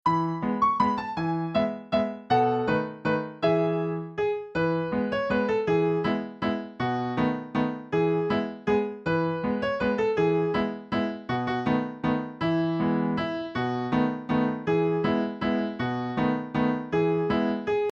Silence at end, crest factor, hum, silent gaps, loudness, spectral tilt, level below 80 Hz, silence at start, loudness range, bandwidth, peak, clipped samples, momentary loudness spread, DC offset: 0 s; 16 dB; none; none; -27 LUFS; -8 dB/octave; -56 dBFS; 0.05 s; 1 LU; 7.6 kHz; -10 dBFS; under 0.1%; 5 LU; under 0.1%